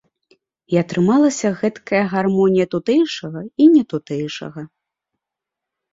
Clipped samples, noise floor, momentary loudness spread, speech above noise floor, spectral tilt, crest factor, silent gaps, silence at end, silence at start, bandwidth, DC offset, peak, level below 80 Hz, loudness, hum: under 0.1%; -84 dBFS; 14 LU; 67 dB; -6 dB/octave; 16 dB; none; 1.25 s; 0.7 s; 7.8 kHz; under 0.1%; -2 dBFS; -60 dBFS; -17 LUFS; none